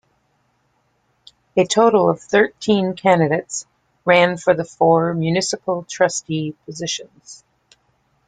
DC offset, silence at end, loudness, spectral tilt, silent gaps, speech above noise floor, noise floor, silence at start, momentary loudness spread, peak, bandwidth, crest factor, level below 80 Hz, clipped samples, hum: under 0.1%; 0.9 s; -18 LUFS; -4.5 dB/octave; none; 47 dB; -65 dBFS; 1.55 s; 12 LU; -2 dBFS; 9.6 kHz; 18 dB; -60 dBFS; under 0.1%; none